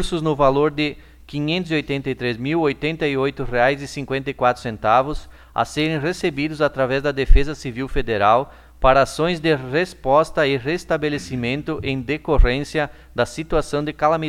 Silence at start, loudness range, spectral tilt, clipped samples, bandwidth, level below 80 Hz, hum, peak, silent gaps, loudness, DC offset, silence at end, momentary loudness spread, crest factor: 0 s; 3 LU; -6 dB/octave; under 0.1%; 13 kHz; -28 dBFS; none; 0 dBFS; none; -21 LUFS; under 0.1%; 0 s; 8 LU; 20 dB